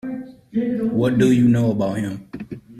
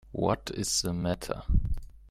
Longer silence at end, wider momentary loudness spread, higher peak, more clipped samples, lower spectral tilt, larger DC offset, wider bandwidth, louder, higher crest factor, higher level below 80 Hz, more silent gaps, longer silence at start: about the same, 0 s vs 0 s; first, 18 LU vs 7 LU; first, -6 dBFS vs -12 dBFS; neither; first, -8 dB/octave vs -4.5 dB/octave; neither; second, 13 kHz vs 15.5 kHz; first, -19 LUFS vs -31 LUFS; about the same, 14 dB vs 18 dB; second, -52 dBFS vs -34 dBFS; neither; about the same, 0.05 s vs 0.05 s